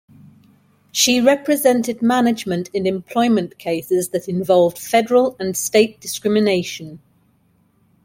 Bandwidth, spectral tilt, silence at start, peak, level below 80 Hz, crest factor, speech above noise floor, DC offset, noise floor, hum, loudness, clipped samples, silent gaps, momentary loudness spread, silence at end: 16.5 kHz; -4 dB/octave; 0.95 s; -2 dBFS; -60 dBFS; 18 dB; 42 dB; under 0.1%; -59 dBFS; none; -18 LUFS; under 0.1%; none; 8 LU; 1.1 s